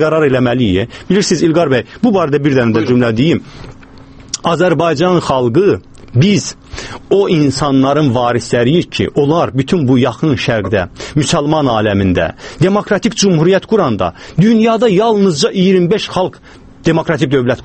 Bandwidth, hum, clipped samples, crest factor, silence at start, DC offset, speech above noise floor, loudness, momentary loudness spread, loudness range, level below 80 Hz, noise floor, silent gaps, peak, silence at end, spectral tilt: 8.8 kHz; none; under 0.1%; 12 dB; 0 s; under 0.1%; 24 dB; -12 LUFS; 7 LU; 2 LU; -40 dBFS; -36 dBFS; none; 0 dBFS; 0 s; -6 dB/octave